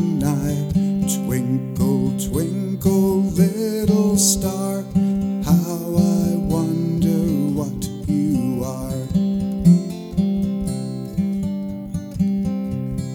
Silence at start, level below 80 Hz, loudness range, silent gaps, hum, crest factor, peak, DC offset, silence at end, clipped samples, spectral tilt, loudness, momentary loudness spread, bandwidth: 0 s; -38 dBFS; 3 LU; none; none; 16 dB; -4 dBFS; under 0.1%; 0 s; under 0.1%; -6.5 dB/octave; -20 LUFS; 9 LU; 17.5 kHz